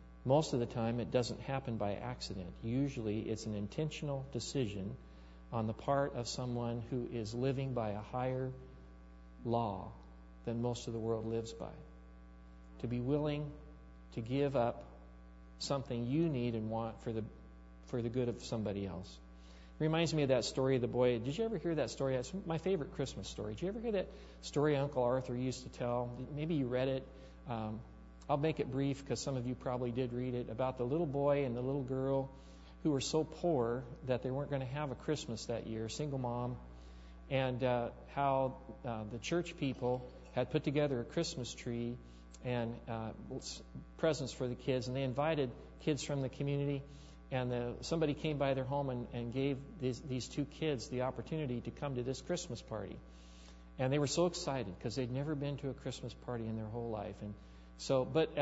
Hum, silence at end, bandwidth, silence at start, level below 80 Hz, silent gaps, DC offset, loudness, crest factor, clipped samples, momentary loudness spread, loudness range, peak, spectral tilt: none; 0 s; 7.6 kHz; 0 s; -56 dBFS; none; under 0.1%; -38 LUFS; 20 dB; under 0.1%; 17 LU; 4 LU; -18 dBFS; -6 dB/octave